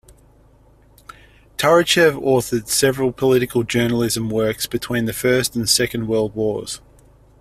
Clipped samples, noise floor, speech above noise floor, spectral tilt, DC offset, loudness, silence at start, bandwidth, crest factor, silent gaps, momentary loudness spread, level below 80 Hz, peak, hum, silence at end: under 0.1%; -51 dBFS; 33 dB; -4 dB/octave; under 0.1%; -18 LUFS; 1.6 s; 16 kHz; 18 dB; none; 8 LU; -48 dBFS; -2 dBFS; none; 0.65 s